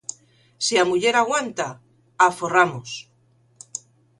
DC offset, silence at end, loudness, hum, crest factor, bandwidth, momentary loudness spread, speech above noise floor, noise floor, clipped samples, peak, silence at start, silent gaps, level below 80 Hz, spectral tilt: under 0.1%; 0.4 s; -20 LUFS; none; 22 dB; 11.5 kHz; 17 LU; 40 dB; -60 dBFS; under 0.1%; -2 dBFS; 0.1 s; none; -66 dBFS; -2.5 dB/octave